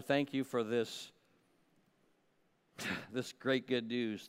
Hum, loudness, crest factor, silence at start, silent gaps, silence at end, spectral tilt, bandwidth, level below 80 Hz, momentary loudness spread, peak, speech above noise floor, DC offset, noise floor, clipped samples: none; -37 LUFS; 20 dB; 0 s; none; 0 s; -5 dB/octave; 16 kHz; -82 dBFS; 9 LU; -20 dBFS; 38 dB; under 0.1%; -75 dBFS; under 0.1%